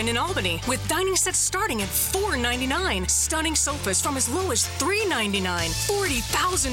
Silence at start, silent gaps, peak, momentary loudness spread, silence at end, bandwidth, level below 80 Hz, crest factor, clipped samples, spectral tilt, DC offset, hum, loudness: 0 s; none; -10 dBFS; 3 LU; 0 s; 17 kHz; -38 dBFS; 14 dB; under 0.1%; -2.5 dB/octave; under 0.1%; none; -23 LUFS